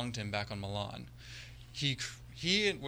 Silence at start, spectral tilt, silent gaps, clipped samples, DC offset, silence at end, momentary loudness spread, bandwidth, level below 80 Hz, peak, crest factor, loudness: 0 s; -4 dB/octave; none; under 0.1%; under 0.1%; 0 s; 18 LU; 19.5 kHz; -58 dBFS; -14 dBFS; 24 dB; -35 LUFS